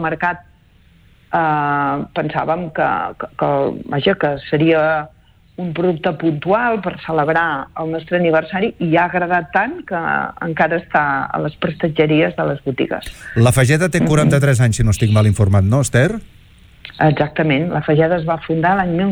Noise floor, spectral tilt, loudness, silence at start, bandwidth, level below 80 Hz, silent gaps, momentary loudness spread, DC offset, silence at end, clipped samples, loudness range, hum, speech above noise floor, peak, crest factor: -50 dBFS; -6.5 dB/octave; -17 LUFS; 0 s; 18.5 kHz; -40 dBFS; none; 8 LU; under 0.1%; 0 s; under 0.1%; 4 LU; none; 34 dB; -2 dBFS; 14 dB